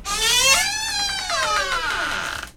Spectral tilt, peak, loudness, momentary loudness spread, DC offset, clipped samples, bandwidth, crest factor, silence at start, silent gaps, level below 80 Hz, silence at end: 0.5 dB/octave; -2 dBFS; -19 LUFS; 9 LU; under 0.1%; under 0.1%; 19.5 kHz; 20 dB; 0 s; none; -42 dBFS; 0.05 s